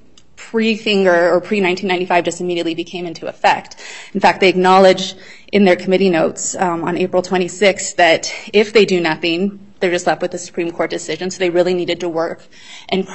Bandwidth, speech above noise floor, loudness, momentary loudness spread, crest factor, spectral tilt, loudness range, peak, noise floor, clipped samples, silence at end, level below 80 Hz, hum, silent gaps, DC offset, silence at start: 8.4 kHz; 26 dB; -16 LUFS; 11 LU; 16 dB; -4 dB/octave; 5 LU; 0 dBFS; -41 dBFS; under 0.1%; 0 s; -56 dBFS; none; none; 0.7%; 0.4 s